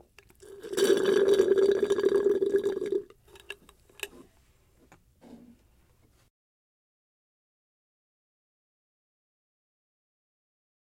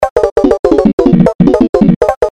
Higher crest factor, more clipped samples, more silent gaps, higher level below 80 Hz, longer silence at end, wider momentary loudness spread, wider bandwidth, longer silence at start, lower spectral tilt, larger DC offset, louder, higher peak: first, 22 dB vs 8 dB; second, under 0.1% vs 2%; second, none vs 0.10-0.16 s, 0.32-0.36 s, 0.59-0.63 s, 0.93-0.98 s, 1.35-1.39 s, 1.69-1.73 s, 1.96-2.01 s, 2.17-2.21 s; second, -66 dBFS vs -28 dBFS; first, 5.6 s vs 0 s; first, 22 LU vs 2 LU; first, 16.5 kHz vs 10.5 kHz; first, 0.5 s vs 0 s; second, -4 dB/octave vs -8.5 dB/octave; neither; second, -26 LUFS vs -9 LUFS; second, -10 dBFS vs 0 dBFS